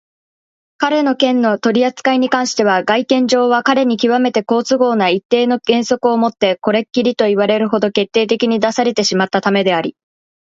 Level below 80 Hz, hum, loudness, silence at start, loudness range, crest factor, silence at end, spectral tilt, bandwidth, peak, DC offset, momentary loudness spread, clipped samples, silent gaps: -62 dBFS; none; -14 LUFS; 0.8 s; 1 LU; 14 dB; 0.5 s; -4.5 dB/octave; 7.8 kHz; 0 dBFS; under 0.1%; 3 LU; under 0.1%; 5.25-5.29 s